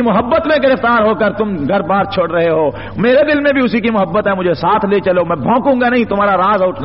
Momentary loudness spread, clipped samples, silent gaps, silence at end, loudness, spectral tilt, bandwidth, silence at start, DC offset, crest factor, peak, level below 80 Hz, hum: 4 LU; under 0.1%; none; 0 s; -13 LUFS; -4.5 dB/octave; 5.8 kHz; 0 s; 0.7%; 10 dB; -2 dBFS; -42 dBFS; none